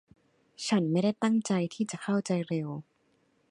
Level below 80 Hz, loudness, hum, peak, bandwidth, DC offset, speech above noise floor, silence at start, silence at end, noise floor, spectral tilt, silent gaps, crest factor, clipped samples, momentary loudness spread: -76 dBFS; -30 LUFS; none; -16 dBFS; 11 kHz; under 0.1%; 41 dB; 0.6 s; 0.7 s; -70 dBFS; -6 dB/octave; none; 16 dB; under 0.1%; 9 LU